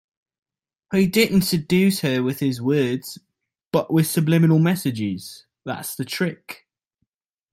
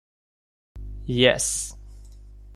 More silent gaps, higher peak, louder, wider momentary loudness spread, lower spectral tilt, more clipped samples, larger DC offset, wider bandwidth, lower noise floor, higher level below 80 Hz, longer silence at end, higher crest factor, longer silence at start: first, 3.67-3.71 s vs none; about the same, -4 dBFS vs -4 dBFS; about the same, -21 LUFS vs -22 LUFS; about the same, 20 LU vs 22 LU; first, -6 dB/octave vs -3 dB/octave; neither; neither; first, 16.5 kHz vs 14.5 kHz; first, -76 dBFS vs -44 dBFS; second, -56 dBFS vs -42 dBFS; first, 1 s vs 0 s; second, 18 dB vs 24 dB; first, 0.9 s vs 0.75 s